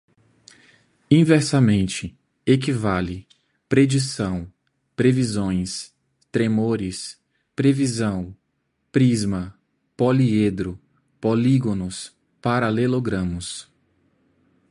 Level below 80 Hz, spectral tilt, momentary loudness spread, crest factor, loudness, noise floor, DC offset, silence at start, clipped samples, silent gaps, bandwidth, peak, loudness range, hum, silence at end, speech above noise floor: -46 dBFS; -6.5 dB/octave; 17 LU; 20 dB; -21 LUFS; -72 dBFS; under 0.1%; 1.1 s; under 0.1%; none; 11.5 kHz; -2 dBFS; 3 LU; none; 1.1 s; 52 dB